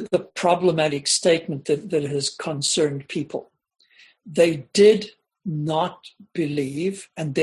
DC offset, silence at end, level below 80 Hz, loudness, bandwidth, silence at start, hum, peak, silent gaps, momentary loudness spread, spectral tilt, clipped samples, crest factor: under 0.1%; 0 s; -64 dBFS; -22 LUFS; 12 kHz; 0 s; none; -4 dBFS; none; 14 LU; -4 dB/octave; under 0.1%; 18 dB